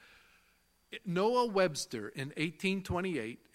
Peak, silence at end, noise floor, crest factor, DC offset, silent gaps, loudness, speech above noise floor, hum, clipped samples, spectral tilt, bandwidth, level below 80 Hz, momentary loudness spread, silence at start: -14 dBFS; 0.2 s; -71 dBFS; 20 dB; under 0.1%; none; -34 LUFS; 37 dB; none; under 0.1%; -5 dB/octave; 16 kHz; -62 dBFS; 11 LU; 0.9 s